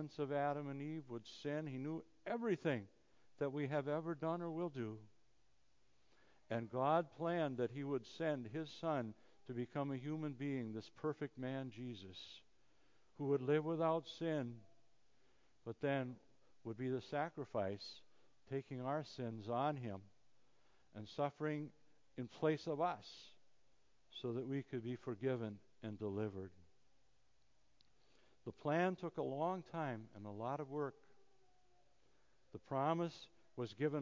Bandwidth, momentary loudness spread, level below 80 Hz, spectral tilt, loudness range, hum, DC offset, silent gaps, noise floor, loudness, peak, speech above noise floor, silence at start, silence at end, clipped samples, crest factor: 7.6 kHz; 15 LU; -80 dBFS; -7.5 dB/octave; 4 LU; none; under 0.1%; none; -80 dBFS; -43 LUFS; -22 dBFS; 38 dB; 0 s; 0 s; under 0.1%; 22 dB